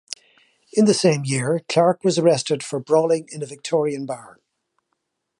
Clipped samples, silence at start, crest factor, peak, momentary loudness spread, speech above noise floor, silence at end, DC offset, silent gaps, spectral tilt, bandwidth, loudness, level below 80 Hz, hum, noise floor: under 0.1%; 0.1 s; 18 dB; -4 dBFS; 14 LU; 56 dB; 1.15 s; under 0.1%; none; -5 dB/octave; 11.5 kHz; -20 LUFS; -68 dBFS; none; -75 dBFS